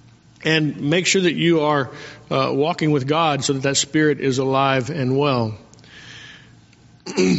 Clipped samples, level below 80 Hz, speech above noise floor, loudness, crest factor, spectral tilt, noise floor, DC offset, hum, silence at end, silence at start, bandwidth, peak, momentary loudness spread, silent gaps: under 0.1%; -58 dBFS; 31 dB; -19 LUFS; 18 dB; -4 dB/octave; -50 dBFS; under 0.1%; none; 0 s; 0.4 s; 8 kHz; -4 dBFS; 20 LU; none